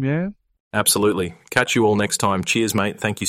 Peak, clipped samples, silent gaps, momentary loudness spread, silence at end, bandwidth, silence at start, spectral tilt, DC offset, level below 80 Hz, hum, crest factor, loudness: -2 dBFS; under 0.1%; 0.60-0.71 s; 8 LU; 0 s; 16 kHz; 0 s; -3.5 dB/octave; under 0.1%; -56 dBFS; none; 18 dB; -19 LUFS